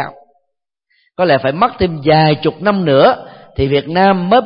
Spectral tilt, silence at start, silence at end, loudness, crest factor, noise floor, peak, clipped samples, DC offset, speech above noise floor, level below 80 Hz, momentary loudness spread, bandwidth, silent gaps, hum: -10.5 dB/octave; 0 s; 0 s; -13 LUFS; 14 dB; -73 dBFS; 0 dBFS; under 0.1%; under 0.1%; 61 dB; -40 dBFS; 12 LU; 5.4 kHz; none; none